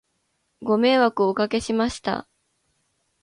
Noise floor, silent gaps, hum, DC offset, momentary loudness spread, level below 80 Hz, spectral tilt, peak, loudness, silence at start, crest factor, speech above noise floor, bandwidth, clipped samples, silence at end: -72 dBFS; none; none; under 0.1%; 11 LU; -54 dBFS; -5 dB/octave; -6 dBFS; -22 LUFS; 0.6 s; 18 dB; 51 dB; 11 kHz; under 0.1%; 1 s